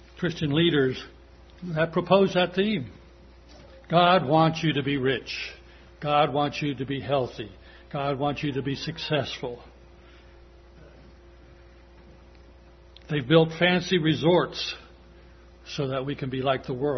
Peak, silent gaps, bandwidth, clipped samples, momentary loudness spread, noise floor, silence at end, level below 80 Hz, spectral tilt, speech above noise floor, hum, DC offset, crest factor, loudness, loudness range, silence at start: -4 dBFS; none; 6.4 kHz; under 0.1%; 15 LU; -51 dBFS; 0 s; -52 dBFS; -6.5 dB/octave; 26 dB; none; under 0.1%; 22 dB; -25 LUFS; 9 LU; 0.15 s